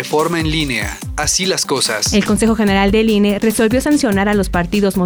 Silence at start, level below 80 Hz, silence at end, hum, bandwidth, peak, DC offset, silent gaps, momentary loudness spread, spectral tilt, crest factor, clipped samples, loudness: 0 s; -30 dBFS; 0 s; none; over 20 kHz; -4 dBFS; under 0.1%; none; 4 LU; -4 dB/octave; 10 dB; under 0.1%; -15 LUFS